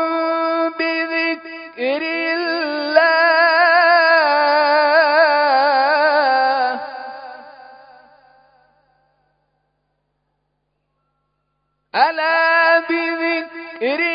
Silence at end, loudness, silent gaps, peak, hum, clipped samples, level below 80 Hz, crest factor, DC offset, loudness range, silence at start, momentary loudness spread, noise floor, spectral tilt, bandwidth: 0 s; -15 LUFS; none; 0 dBFS; 50 Hz at -70 dBFS; under 0.1%; -74 dBFS; 18 dB; under 0.1%; 11 LU; 0 s; 13 LU; -71 dBFS; -6.5 dB/octave; 5.2 kHz